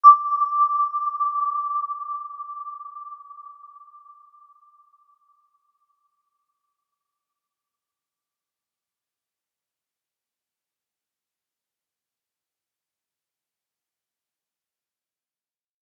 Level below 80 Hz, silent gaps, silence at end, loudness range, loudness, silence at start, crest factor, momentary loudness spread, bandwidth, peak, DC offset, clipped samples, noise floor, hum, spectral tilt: under -90 dBFS; none; 12.35 s; 23 LU; -22 LUFS; 0.05 s; 26 dB; 21 LU; 5.8 kHz; -2 dBFS; under 0.1%; under 0.1%; under -90 dBFS; none; -2 dB/octave